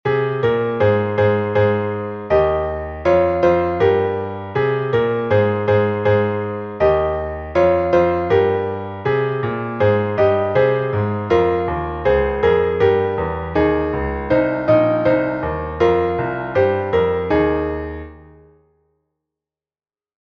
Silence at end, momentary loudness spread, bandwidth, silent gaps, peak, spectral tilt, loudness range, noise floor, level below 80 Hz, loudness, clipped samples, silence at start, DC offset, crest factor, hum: 2 s; 7 LU; 6.2 kHz; none; -2 dBFS; -8.5 dB/octave; 2 LU; under -90 dBFS; -38 dBFS; -18 LUFS; under 0.1%; 0.05 s; under 0.1%; 16 dB; none